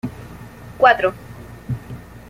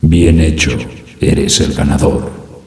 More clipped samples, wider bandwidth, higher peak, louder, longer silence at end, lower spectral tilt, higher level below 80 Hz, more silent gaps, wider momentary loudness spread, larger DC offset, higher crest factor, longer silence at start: neither; first, 16 kHz vs 11 kHz; about the same, -2 dBFS vs 0 dBFS; second, -18 LUFS vs -12 LUFS; about the same, 0.1 s vs 0.1 s; about the same, -6 dB/octave vs -5 dB/octave; second, -46 dBFS vs -20 dBFS; neither; first, 24 LU vs 12 LU; neither; first, 20 dB vs 12 dB; about the same, 0.05 s vs 0 s